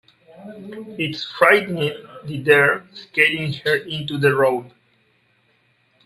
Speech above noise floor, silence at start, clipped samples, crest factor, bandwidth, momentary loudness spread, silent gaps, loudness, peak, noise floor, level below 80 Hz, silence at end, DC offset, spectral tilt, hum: 42 dB; 0.4 s; under 0.1%; 20 dB; 14.5 kHz; 20 LU; none; -19 LUFS; 0 dBFS; -62 dBFS; -62 dBFS; 1.35 s; under 0.1%; -5.5 dB/octave; none